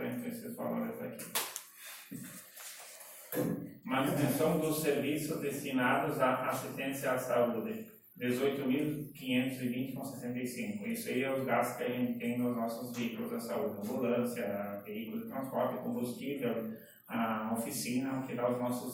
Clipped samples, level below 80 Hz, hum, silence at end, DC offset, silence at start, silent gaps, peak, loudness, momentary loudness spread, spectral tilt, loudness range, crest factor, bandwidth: under 0.1%; -72 dBFS; none; 0 s; under 0.1%; 0 s; none; -18 dBFS; -35 LUFS; 12 LU; -5 dB/octave; 5 LU; 18 dB; 16.5 kHz